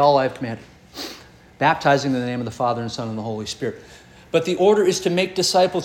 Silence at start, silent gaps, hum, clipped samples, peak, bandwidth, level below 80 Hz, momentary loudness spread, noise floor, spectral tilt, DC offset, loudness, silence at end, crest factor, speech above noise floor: 0 s; none; none; under 0.1%; -4 dBFS; 17 kHz; -56 dBFS; 17 LU; -44 dBFS; -4.5 dB/octave; under 0.1%; -21 LUFS; 0 s; 18 dB; 24 dB